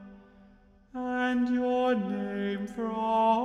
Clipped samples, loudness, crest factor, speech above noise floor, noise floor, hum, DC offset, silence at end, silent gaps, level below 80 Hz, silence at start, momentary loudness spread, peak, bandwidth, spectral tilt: under 0.1%; -29 LUFS; 14 dB; 30 dB; -58 dBFS; none; under 0.1%; 0 s; none; -62 dBFS; 0 s; 7 LU; -14 dBFS; 8.2 kHz; -7 dB/octave